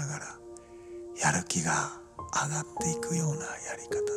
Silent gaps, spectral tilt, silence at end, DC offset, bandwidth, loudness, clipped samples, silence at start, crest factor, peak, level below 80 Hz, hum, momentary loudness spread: none; -3.5 dB/octave; 0 s; under 0.1%; 15 kHz; -31 LUFS; under 0.1%; 0 s; 22 dB; -10 dBFS; -60 dBFS; none; 17 LU